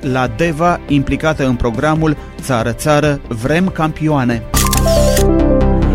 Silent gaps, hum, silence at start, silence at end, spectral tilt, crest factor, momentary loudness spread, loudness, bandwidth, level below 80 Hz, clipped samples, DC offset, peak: none; none; 0 s; 0 s; -5.5 dB/octave; 12 dB; 5 LU; -14 LUFS; 16.5 kHz; -20 dBFS; under 0.1%; under 0.1%; 0 dBFS